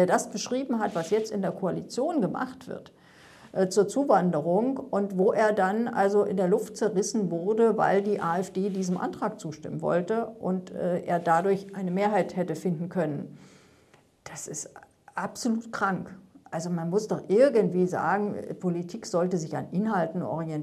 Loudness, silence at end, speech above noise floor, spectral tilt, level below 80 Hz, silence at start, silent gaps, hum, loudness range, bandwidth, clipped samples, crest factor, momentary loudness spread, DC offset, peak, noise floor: -27 LUFS; 0 s; 34 dB; -6 dB/octave; -72 dBFS; 0 s; none; none; 8 LU; 13.5 kHz; under 0.1%; 20 dB; 12 LU; under 0.1%; -8 dBFS; -60 dBFS